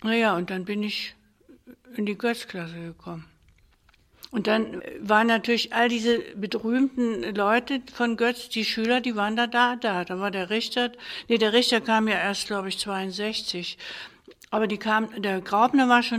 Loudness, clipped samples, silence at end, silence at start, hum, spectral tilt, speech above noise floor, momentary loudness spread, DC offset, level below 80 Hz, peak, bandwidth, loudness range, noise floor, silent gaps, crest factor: -25 LUFS; under 0.1%; 0 s; 0 s; none; -4 dB/octave; 36 dB; 14 LU; under 0.1%; -64 dBFS; -4 dBFS; 15.5 kHz; 7 LU; -61 dBFS; none; 20 dB